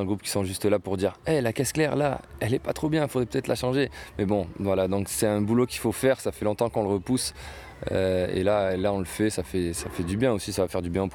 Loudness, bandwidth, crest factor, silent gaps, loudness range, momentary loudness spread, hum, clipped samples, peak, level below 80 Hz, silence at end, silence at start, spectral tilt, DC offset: -26 LUFS; 19.5 kHz; 16 dB; none; 1 LU; 5 LU; none; under 0.1%; -10 dBFS; -48 dBFS; 0 s; 0 s; -5.5 dB/octave; under 0.1%